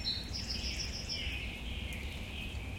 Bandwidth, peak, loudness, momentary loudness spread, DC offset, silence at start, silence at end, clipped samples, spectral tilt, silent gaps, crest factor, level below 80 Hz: 16.5 kHz; -24 dBFS; -38 LUFS; 5 LU; under 0.1%; 0 s; 0 s; under 0.1%; -3 dB/octave; none; 14 dB; -44 dBFS